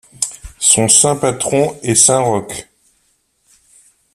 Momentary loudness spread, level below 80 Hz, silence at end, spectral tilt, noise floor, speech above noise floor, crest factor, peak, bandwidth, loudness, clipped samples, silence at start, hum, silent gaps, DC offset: 13 LU; -48 dBFS; 1.5 s; -3 dB/octave; -61 dBFS; 47 dB; 16 dB; 0 dBFS; over 20 kHz; -12 LUFS; under 0.1%; 0.2 s; none; none; under 0.1%